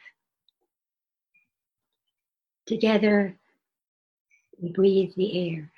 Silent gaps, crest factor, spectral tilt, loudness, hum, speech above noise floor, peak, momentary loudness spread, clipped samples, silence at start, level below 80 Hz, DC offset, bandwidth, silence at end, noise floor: 3.88-4.25 s; 20 dB; -7.5 dB/octave; -24 LUFS; none; over 67 dB; -8 dBFS; 12 LU; under 0.1%; 2.65 s; -70 dBFS; under 0.1%; 6.6 kHz; 0.1 s; under -90 dBFS